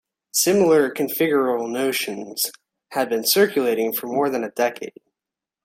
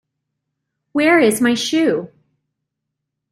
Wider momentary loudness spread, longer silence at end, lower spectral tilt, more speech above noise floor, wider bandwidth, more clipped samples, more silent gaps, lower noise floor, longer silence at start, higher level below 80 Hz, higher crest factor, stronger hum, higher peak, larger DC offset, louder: about the same, 9 LU vs 10 LU; second, 0.75 s vs 1.25 s; about the same, -3 dB/octave vs -3.5 dB/octave; about the same, 67 dB vs 64 dB; about the same, 16.5 kHz vs 16 kHz; neither; neither; first, -88 dBFS vs -79 dBFS; second, 0.35 s vs 0.95 s; about the same, -68 dBFS vs -64 dBFS; about the same, 18 dB vs 16 dB; neither; about the same, -4 dBFS vs -2 dBFS; neither; second, -21 LUFS vs -16 LUFS